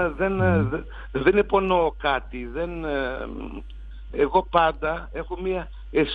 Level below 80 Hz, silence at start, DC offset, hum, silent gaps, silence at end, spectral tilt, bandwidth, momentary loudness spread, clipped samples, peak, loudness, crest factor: -38 dBFS; 0 s; under 0.1%; none; none; 0 s; -9 dB/octave; 4.9 kHz; 14 LU; under 0.1%; -2 dBFS; -24 LUFS; 22 dB